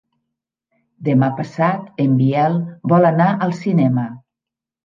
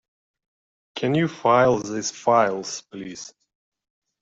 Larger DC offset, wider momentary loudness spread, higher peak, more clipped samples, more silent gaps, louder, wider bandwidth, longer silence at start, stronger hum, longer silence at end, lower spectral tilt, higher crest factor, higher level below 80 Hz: neither; second, 7 LU vs 19 LU; about the same, -2 dBFS vs -4 dBFS; neither; neither; first, -17 LUFS vs -21 LUFS; second, 7.2 kHz vs 8 kHz; about the same, 1 s vs 0.95 s; neither; second, 0.65 s vs 0.9 s; first, -9.5 dB/octave vs -5 dB/octave; about the same, 16 dB vs 20 dB; about the same, -64 dBFS vs -62 dBFS